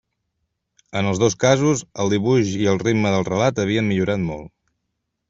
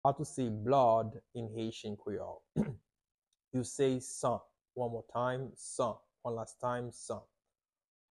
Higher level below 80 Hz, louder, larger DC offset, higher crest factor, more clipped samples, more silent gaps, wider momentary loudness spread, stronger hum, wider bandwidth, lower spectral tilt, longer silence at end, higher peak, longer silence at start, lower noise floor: first, -52 dBFS vs -66 dBFS; first, -20 LUFS vs -36 LUFS; neither; about the same, 18 dB vs 20 dB; neither; second, none vs 3.14-3.18 s; second, 7 LU vs 13 LU; neither; second, 8 kHz vs 12 kHz; about the same, -5.5 dB/octave vs -6 dB/octave; second, 0.8 s vs 0.95 s; first, -2 dBFS vs -16 dBFS; first, 0.95 s vs 0.05 s; second, -76 dBFS vs under -90 dBFS